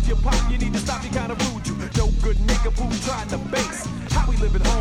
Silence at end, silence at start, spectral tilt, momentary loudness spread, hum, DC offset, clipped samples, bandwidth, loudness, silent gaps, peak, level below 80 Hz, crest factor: 0 s; 0 s; -5 dB/octave; 4 LU; none; under 0.1%; under 0.1%; 12 kHz; -24 LUFS; none; -6 dBFS; -22 dBFS; 14 dB